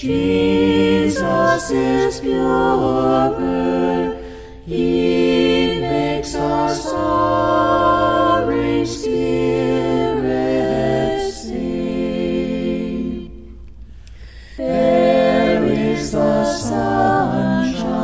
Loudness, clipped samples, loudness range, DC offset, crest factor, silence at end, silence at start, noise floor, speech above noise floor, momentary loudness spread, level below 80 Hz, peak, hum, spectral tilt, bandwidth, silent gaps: -17 LUFS; under 0.1%; 5 LU; under 0.1%; 16 dB; 0 s; 0 s; -37 dBFS; 21 dB; 8 LU; -38 dBFS; -2 dBFS; none; -6 dB/octave; 8 kHz; none